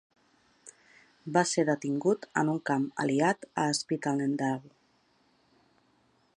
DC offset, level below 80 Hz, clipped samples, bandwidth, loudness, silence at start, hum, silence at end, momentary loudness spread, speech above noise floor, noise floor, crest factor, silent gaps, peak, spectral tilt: under 0.1%; -78 dBFS; under 0.1%; 11 kHz; -29 LUFS; 0.65 s; none; 1.7 s; 4 LU; 40 dB; -68 dBFS; 22 dB; none; -10 dBFS; -5 dB/octave